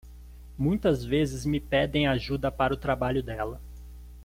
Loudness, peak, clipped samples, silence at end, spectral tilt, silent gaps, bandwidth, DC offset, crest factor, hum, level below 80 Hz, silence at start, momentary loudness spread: -28 LUFS; -10 dBFS; under 0.1%; 0 s; -6.5 dB/octave; none; 16.5 kHz; under 0.1%; 18 dB; 60 Hz at -40 dBFS; -42 dBFS; 0.05 s; 20 LU